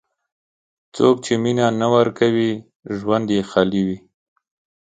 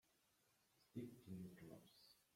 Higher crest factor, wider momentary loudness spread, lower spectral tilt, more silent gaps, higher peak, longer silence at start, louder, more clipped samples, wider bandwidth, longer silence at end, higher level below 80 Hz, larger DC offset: about the same, 20 dB vs 20 dB; about the same, 13 LU vs 11 LU; about the same, -6 dB/octave vs -6.5 dB/octave; first, 2.76-2.80 s vs none; first, 0 dBFS vs -40 dBFS; first, 0.95 s vs 0.05 s; first, -19 LUFS vs -59 LUFS; neither; second, 9.4 kHz vs 16.5 kHz; first, 0.85 s vs 0.1 s; first, -56 dBFS vs -88 dBFS; neither